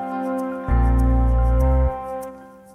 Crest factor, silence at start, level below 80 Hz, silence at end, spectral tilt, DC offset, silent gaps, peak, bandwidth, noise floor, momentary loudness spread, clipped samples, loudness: 12 dB; 0 s; -20 dBFS; 0.25 s; -9.5 dB/octave; under 0.1%; none; -8 dBFS; 3 kHz; -39 dBFS; 12 LU; under 0.1%; -21 LUFS